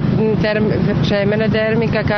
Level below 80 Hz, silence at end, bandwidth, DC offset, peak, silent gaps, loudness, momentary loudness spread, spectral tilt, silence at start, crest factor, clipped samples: -36 dBFS; 0 s; 6.4 kHz; under 0.1%; -4 dBFS; none; -16 LUFS; 1 LU; -8 dB/octave; 0 s; 12 dB; under 0.1%